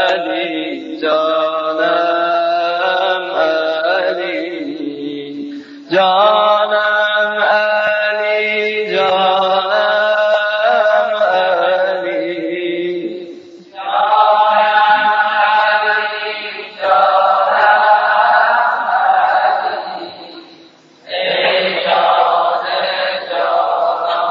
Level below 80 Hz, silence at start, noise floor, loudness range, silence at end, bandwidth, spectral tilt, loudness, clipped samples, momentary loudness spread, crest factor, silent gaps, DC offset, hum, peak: -78 dBFS; 0 s; -44 dBFS; 4 LU; 0 s; 7 kHz; -4.5 dB/octave; -14 LUFS; under 0.1%; 12 LU; 14 dB; none; under 0.1%; none; 0 dBFS